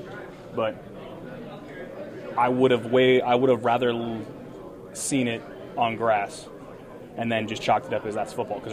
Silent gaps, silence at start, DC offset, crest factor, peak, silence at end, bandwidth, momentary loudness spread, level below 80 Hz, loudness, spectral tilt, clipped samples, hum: none; 0 s; under 0.1%; 20 dB; -6 dBFS; 0 s; 14 kHz; 20 LU; -58 dBFS; -25 LUFS; -5 dB/octave; under 0.1%; none